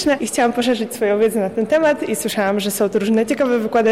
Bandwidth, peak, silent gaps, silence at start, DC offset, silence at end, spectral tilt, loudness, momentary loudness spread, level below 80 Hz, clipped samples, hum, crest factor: 16 kHz; -8 dBFS; none; 0 s; 0.2%; 0 s; -4 dB/octave; -18 LUFS; 3 LU; -56 dBFS; under 0.1%; none; 10 dB